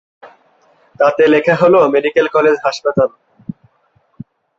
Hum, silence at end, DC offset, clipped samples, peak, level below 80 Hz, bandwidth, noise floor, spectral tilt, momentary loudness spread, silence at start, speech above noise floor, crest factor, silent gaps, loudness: none; 1.5 s; under 0.1%; under 0.1%; 0 dBFS; -56 dBFS; 7.6 kHz; -58 dBFS; -6 dB/octave; 22 LU; 0.25 s; 46 dB; 14 dB; none; -13 LUFS